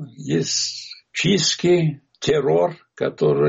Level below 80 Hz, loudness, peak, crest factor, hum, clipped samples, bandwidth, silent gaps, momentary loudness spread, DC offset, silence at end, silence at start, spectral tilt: -58 dBFS; -20 LUFS; -6 dBFS; 14 dB; none; under 0.1%; 8 kHz; none; 9 LU; under 0.1%; 0 s; 0 s; -4.5 dB/octave